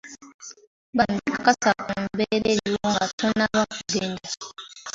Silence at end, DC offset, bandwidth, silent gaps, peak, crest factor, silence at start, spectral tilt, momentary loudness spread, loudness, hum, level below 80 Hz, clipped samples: 0.05 s; under 0.1%; 7.8 kHz; 0.34-0.39 s, 0.67-0.93 s, 3.13-3.18 s; -4 dBFS; 22 dB; 0.05 s; -3.5 dB/octave; 18 LU; -24 LUFS; none; -56 dBFS; under 0.1%